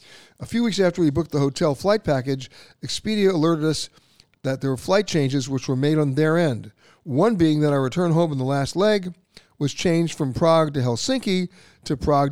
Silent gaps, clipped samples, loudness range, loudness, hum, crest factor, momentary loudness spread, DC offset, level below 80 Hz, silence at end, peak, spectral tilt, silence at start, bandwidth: none; under 0.1%; 2 LU; -22 LUFS; none; 16 dB; 11 LU; 0.4%; -50 dBFS; 0 s; -6 dBFS; -6 dB/octave; 0.1 s; 15 kHz